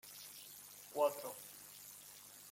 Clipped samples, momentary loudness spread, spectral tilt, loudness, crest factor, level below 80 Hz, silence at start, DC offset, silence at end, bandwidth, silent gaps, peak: under 0.1%; 16 LU; -2 dB/octave; -45 LUFS; 24 dB; -86 dBFS; 0.05 s; under 0.1%; 0 s; 16.5 kHz; none; -22 dBFS